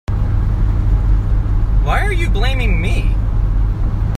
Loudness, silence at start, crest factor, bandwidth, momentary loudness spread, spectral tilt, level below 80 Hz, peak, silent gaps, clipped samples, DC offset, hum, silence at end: -18 LUFS; 0.1 s; 12 dB; 9.2 kHz; 2 LU; -7 dB/octave; -14 dBFS; -2 dBFS; none; under 0.1%; under 0.1%; none; 0 s